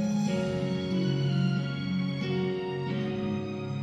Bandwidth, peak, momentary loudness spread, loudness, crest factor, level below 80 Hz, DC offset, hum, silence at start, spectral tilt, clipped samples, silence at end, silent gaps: 9.6 kHz; -18 dBFS; 5 LU; -30 LUFS; 12 dB; -56 dBFS; under 0.1%; none; 0 s; -7 dB/octave; under 0.1%; 0 s; none